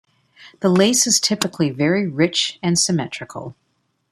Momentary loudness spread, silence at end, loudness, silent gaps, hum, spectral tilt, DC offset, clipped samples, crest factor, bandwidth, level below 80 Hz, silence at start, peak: 16 LU; 0.6 s; -18 LUFS; none; none; -3.5 dB/octave; under 0.1%; under 0.1%; 18 dB; 14.5 kHz; -60 dBFS; 0.4 s; -2 dBFS